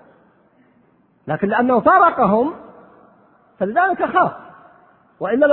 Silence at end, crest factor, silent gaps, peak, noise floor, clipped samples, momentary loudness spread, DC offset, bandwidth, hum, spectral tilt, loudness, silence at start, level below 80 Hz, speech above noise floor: 0 s; 18 dB; none; 0 dBFS; -57 dBFS; under 0.1%; 16 LU; under 0.1%; 4.2 kHz; none; -10.5 dB/octave; -17 LUFS; 1.25 s; -56 dBFS; 41 dB